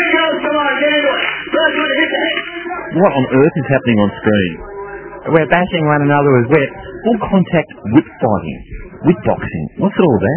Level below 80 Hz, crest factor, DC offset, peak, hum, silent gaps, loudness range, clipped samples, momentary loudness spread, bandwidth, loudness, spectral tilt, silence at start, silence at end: -40 dBFS; 14 dB; under 0.1%; 0 dBFS; none; none; 2 LU; under 0.1%; 11 LU; 4 kHz; -14 LUFS; -10 dB/octave; 0 s; 0 s